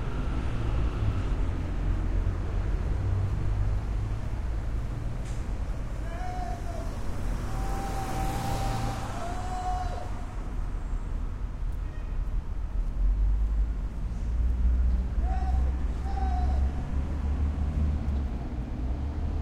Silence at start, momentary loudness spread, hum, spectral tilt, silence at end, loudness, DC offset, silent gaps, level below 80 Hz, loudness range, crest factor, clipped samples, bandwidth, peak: 0 s; 7 LU; none; -7 dB/octave; 0 s; -32 LUFS; under 0.1%; none; -30 dBFS; 5 LU; 14 dB; under 0.1%; 12.5 kHz; -14 dBFS